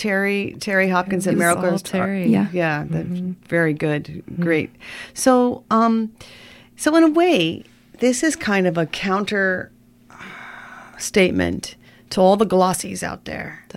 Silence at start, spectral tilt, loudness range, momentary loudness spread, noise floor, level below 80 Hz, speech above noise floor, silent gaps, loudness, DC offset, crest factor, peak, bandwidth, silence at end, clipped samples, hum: 0 s; -5 dB/octave; 3 LU; 16 LU; -45 dBFS; -52 dBFS; 26 dB; none; -19 LUFS; under 0.1%; 18 dB; -2 dBFS; 16.5 kHz; 0.15 s; under 0.1%; none